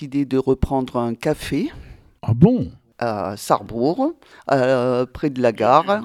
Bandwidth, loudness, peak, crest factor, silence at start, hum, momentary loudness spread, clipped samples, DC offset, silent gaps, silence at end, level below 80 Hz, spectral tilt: 15.5 kHz; -20 LUFS; 0 dBFS; 20 dB; 0 s; none; 10 LU; under 0.1%; under 0.1%; none; 0 s; -40 dBFS; -7 dB/octave